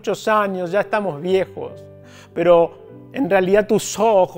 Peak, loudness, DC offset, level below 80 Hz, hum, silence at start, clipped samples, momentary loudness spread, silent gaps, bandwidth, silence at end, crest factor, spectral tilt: -2 dBFS; -18 LUFS; under 0.1%; -52 dBFS; none; 0.05 s; under 0.1%; 14 LU; none; 16 kHz; 0 s; 18 dB; -5 dB/octave